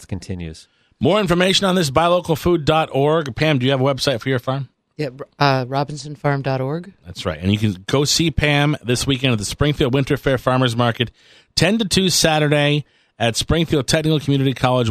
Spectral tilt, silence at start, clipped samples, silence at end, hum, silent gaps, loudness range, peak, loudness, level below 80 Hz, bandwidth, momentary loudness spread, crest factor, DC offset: -5 dB/octave; 0 s; under 0.1%; 0 s; none; none; 4 LU; 0 dBFS; -18 LUFS; -38 dBFS; 15 kHz; 11 LU; 18 dB; under 0.1%